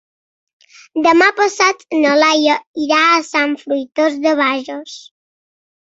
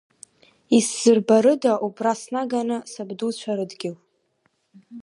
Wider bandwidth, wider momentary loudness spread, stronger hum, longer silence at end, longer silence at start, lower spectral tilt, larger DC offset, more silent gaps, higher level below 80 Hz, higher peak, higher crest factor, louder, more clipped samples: second, 8 kHz vs 11.5 kHz; about the same, 13 LU vs 14 LU; neither; first, 0.95 s vs 0 s; first, 0.95 s vs 0.7 s; second, -1.5 dB/octave vs -4.5 dB/octave; neither; first, 2.67-2.74 s vs none; first, -66 dBFS vs -76 dBFS; first, 0 dBFS vs -4 dBFS; about the same, 16 dB vs 18 dB; first, -14 LUFS vs -21 LUFS; neither